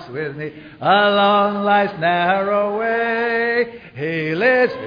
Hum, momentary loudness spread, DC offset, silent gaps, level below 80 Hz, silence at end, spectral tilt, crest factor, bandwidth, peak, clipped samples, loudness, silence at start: none; 13 LU; under 0.1%; none; -58 dBFS; 0 s; -7.5 dB/octave; 14 dB; 5.2 kHz; -4 dBFS; under 0.1%; -18 LUFS; 0 s